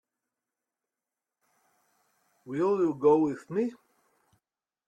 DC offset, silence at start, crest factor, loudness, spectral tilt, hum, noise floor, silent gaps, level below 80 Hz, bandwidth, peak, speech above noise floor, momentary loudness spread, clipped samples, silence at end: under 0.1%; 2.45 s; 20 dB; -27 LUFS; -8.5 dB/octave; none; -90 dBFS; none; -74 dBFS; 9.2 kHz; -12 dBFS; 63 dB; 10 LU; under 0.1%; 1.15 s